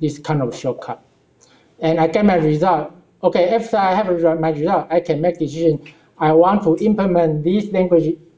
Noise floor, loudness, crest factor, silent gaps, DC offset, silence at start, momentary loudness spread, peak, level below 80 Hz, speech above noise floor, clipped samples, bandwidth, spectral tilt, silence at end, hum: -53 dBFS; -17 LUFS; 16 dB; none; under 0.1%; 0 s; 8 LU; -2 dBFS; -52 dBFS; 37 dB; under 0.1%; 8 kHz; -7.5 dB/octave; 0.2 s; none